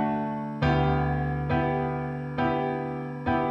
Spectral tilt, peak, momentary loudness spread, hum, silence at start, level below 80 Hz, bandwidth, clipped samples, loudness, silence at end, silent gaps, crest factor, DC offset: -9 dB/octave; -12 dBFS; 7 LU; none; 0 s; -40 dBFS; 5.8 kHz; under 0.1%; -27 LUFS; 0 s; none; 16 dB; under 0.1%